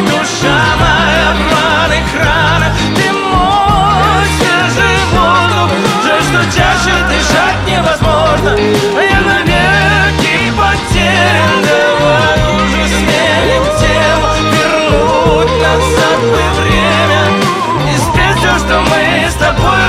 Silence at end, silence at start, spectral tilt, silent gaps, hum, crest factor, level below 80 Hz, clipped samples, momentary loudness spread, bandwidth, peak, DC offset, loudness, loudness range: 0 s; 0 s; -4.5 dB/octave; none; none; 10 dB; -22 dBFS; under 0.1%; 2 LU; 16 kHz; 0 dBFS; under 0.1%; -9 LUFS; 1 LU